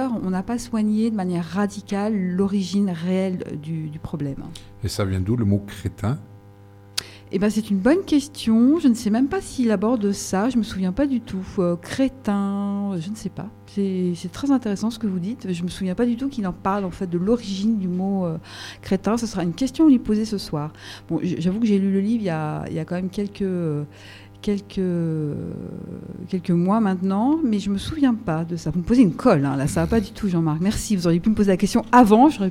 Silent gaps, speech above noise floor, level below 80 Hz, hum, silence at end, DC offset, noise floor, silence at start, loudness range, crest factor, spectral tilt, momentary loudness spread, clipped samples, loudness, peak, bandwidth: none; 25 dB; -46 dBFS; none; 0 s; under 0.1%; -46 dBFS; 0 s; 6 LU; 22 dB; -6.5 dB/octave; 12 LU; under 0.1%; -22 LUFS; 0 dBFS; 15 kHz